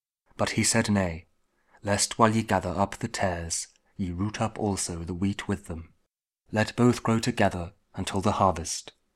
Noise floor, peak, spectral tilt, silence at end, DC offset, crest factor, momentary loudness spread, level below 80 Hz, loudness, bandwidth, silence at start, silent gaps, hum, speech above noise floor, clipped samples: -76 dBFS; -4 dBFS; -4.5 dB/octave; 0.25 s; under 0.1%; 24 dB; 12 LU; -50 dBFS; -27 LUFS; 15 kHz; 0.4 s; none; none; 49 dB; under 0.1%